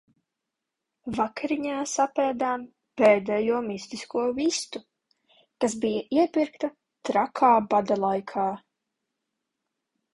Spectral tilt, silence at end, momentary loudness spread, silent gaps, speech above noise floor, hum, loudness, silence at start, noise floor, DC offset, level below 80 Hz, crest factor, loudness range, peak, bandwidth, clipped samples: -4 dB/octave; 1.55 s; 14 LU; none; 60 dB; none; -26 LUFS; 1.05 s; -85 dBFS; under 0.1%; -66 dBFS; 20 dB; 3 LU; -6 dBFS; 11.5 kHz; under 0.1%